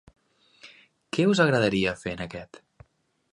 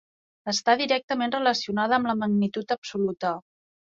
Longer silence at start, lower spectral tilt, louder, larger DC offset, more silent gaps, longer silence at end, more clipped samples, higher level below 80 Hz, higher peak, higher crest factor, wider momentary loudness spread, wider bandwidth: first, 0.65 s vs 0.45 s; first, -5.5 dB/octave vs -4 dB/octave; about the same, -25 LUFS vs -25 LUFS; neither; second, none vs 1.04-1.08 s, 2.78-2.82 s; first, 0.9 s vs 0.55 s; neither; first, -56 dBFS vs -68 dBFS; about the same, -6 dBFS vs -6 dBFS; about the same, 22 dB vs 20 dB; first, 15 LU vs 7 LU; first, 11 kHz vs 7.8 kHz